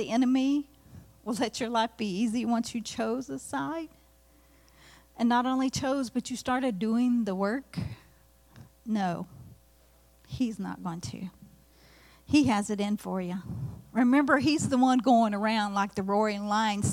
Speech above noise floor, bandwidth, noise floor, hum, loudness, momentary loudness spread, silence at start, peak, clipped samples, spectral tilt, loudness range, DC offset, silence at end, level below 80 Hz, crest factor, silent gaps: 33 dB; 15.5 kHz; -60 dBFS; none; -28 LUFS; 15 LU; 0 s; -10 dBFS; under 0.1%; -5 dB/octave; 10 LU; under 0.1%; 0 s; -60 dBFS; 18 dB; none